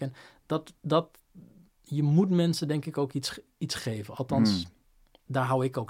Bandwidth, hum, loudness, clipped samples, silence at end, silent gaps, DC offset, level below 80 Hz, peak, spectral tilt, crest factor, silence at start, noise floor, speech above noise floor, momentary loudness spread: 16 kHz; none; -29 LUFS; under 0.1%; 0.05 s; none; under 0.1%; -62 dBFS; -10 dBFS; -6.5 dB/octave; 20 dB; 0 s; -62 dBFS; 34 dB; 11 LU